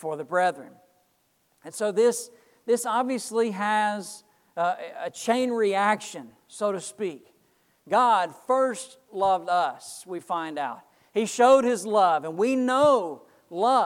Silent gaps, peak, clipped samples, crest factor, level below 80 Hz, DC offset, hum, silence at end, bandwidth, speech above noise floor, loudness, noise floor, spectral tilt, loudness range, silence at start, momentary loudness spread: none; -6 dBFS; under 0.1%; 18 dB; -74 dBFS; under 0.1%; none; 0 s; 16 kHz; 44 dB; -25 LUFS; -69 dBFS; -3.5 dB/octave; 5 LU; 0 s; 18 LU